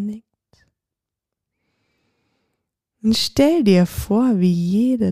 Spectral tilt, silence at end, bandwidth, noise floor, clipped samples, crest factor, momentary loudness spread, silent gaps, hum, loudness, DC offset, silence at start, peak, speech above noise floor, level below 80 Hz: -6.5 dB/octave; 0 s; 15.5 kHz; -85 dBFS; under 0.1%; 16 dB; 8 LU; none; none; -17 LUFS; under 0.1%; 0 s; -4 dBFS; 69 dB; -44 dBFS